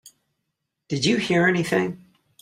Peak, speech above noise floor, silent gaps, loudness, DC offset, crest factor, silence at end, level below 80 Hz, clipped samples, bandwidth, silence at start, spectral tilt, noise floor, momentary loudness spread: -6 dBFS; 58 dB; none; -22 LUFS; under 0.1%; 18 dB; 0.45 s; -60 dBFS; under 0.1%; 15.5 kHz; 0.9 s; -5 dB/octave; -79 dBFS; 11 LU